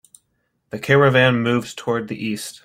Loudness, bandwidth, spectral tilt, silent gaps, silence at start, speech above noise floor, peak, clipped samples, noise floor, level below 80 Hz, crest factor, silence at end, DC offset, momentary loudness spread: -18 LUFS; 16 kHz; -5.5 dB/octave; none; 0.75 s; 51 dB; -2 dBFS; under 0.1%; -70 dBFS; -56 dBFS; 18 dB; 0.1 s; under 0.1%; 13 LU